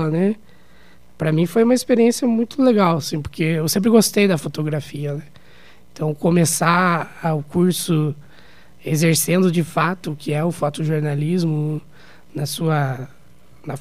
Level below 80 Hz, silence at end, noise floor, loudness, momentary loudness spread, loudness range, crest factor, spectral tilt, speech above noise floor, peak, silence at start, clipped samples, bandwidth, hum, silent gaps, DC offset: -54 dBFS; 0 s; -51 dBFS; -19 LUFS; 12 LU; 5 LU; 20 dB; -5.5 dB/octave; 32 dB; 0 dBFS; 0 s; under 0.1%; 16 kHz; none; none; 0.8%